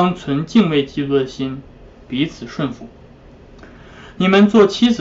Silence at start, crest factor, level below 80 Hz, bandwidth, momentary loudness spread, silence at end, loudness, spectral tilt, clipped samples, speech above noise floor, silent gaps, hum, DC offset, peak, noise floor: 0 s; 16 dB; -46 dBFS; 7.8 kHz; 15 LU; 0 s; -17 LUFS; -6.5 dB/octave; under 0.1%; 26 dB; none; none; under 0.1%; -2 dBFS; -42 dBFS